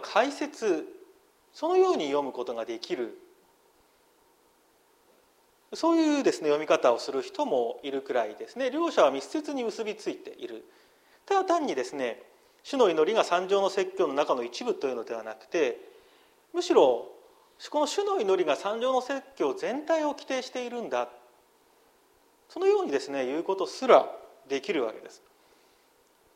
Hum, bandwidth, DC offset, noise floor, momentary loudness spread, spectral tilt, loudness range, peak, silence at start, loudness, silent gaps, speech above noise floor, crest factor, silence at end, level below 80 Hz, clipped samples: none; 14 kHz; under 0.1%; -64 dBFS; 13 LU; -3.5 dB/octave; 5 LU; -4 dBFS; 0 s; -28 LUFS; none; 37 dB; 24 dB; 1.2 s; -80 dBFS; under 0.1%